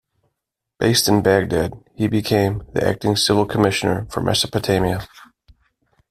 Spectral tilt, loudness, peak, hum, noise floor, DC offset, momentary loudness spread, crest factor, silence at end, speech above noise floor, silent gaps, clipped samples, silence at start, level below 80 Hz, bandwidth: -4.5 dB/octave; -19 LUFS; -2 dBFS; none; -80 dBFS; under 0.1%; 7 LU; 18 dB; 0.85 s; 62 dB; none; under 0.1%; 0.8 s; -44 dBFS; 16 kHz